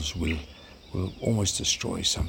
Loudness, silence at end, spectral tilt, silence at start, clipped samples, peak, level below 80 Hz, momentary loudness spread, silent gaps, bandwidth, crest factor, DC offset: -28 LUFS; 0 s; -3.5 dB/octave; 0 s; under 0.1%; -12 dBFS; -42 dBFS; 14 LU; none; 18 kHz; 18 dB; under 0.1%